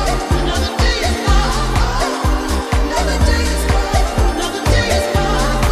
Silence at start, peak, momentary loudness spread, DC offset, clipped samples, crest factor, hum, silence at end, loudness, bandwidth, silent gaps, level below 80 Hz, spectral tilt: 0 s; -2 dBFS; 3 LU; under 0.1%; under 0.1%; 12 dB; none; 0 s; -16 LUFS; 15 kHz; none; -18 dBFS; -4.5 dB/octave